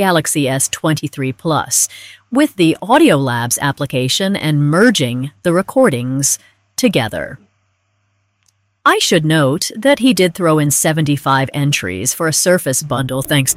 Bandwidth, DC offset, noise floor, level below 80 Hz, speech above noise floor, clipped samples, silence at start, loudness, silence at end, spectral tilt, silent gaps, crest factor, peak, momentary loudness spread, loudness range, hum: 16 kHz; under 0.1%; -63 dBFS; -52 dBFS; 49 dB; under 0.1%; 0 s; -14 LUFS; 0 s; -4 dB/octave; none; 14 dB; 0 dBFS; 7 LU; 4 LU; none